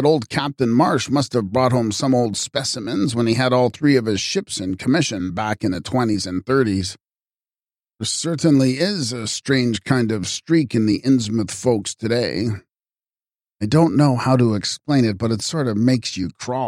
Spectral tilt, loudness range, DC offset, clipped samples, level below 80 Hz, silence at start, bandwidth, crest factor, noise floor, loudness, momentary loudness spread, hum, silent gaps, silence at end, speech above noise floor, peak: -5.5 dB/octave; 3 LU; under 0.1%; under 0.1%; -54 dBFS; 0 s; 13.5 kHz; 16 dB; under -90 dBFS; -19 LUFS; 7 LU; none; none; 0 s; over 71 dB; -4 dBFS